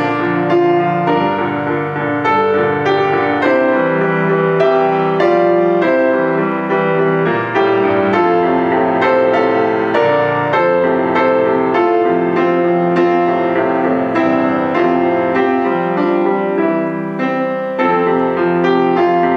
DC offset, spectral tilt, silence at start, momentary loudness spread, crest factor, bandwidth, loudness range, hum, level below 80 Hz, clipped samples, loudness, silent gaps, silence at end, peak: under 0.1%; -8 dB/octave; 0 s; 3 LU; 14 dB; 6.6 kHz; 2 LU; none; -58 dBFS; under 0.1%; -14 LUFS; none; 0 s; 0 dBFS